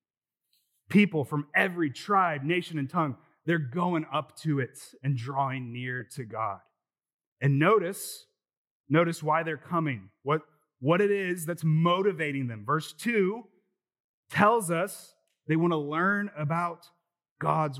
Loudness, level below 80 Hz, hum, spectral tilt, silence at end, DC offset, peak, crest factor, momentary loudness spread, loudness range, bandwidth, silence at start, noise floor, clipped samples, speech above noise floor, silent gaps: -28 LUFS; -86 dBFS; none; -6.5 dB/octave; 0 s; under 0.1%; -6 dBFS; 22 dB; 11 LU; 4 LU; 15.5 kHz; 0.9 s; -89 dBFS; under 0.1%; 61 dB; 7.14-7.19 s, 7.27-7.37 s, 8.57-8.65 s, 8.71-8.84 s, 14.00-14.23 s, 17.31-17.36 s